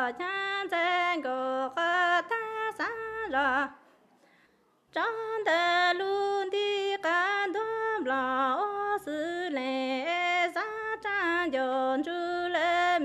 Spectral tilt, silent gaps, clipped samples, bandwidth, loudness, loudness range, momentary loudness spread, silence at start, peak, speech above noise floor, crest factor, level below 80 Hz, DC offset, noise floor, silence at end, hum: -2.5 dB/octave; none; under 0.1%; 13.5 kHz; -29 LUFS; 2 LU; 7 LU; 0 s; -14 dBFS; 38 dB; 16 dB; -70 dBFS; under 0.1%; -67 dBFS; 0 s; none